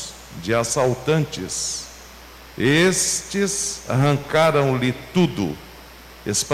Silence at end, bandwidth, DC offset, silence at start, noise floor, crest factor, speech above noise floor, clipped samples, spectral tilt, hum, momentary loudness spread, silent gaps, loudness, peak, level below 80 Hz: 0 s; 16 kHz; under 0.1%; 0 s; -42 dBFS; 14 dB; 22 dB; under 0.1%; -4 dB/octave; none; 19 LU; none; -20 LUFS; -8 dBFS; -48 dBFS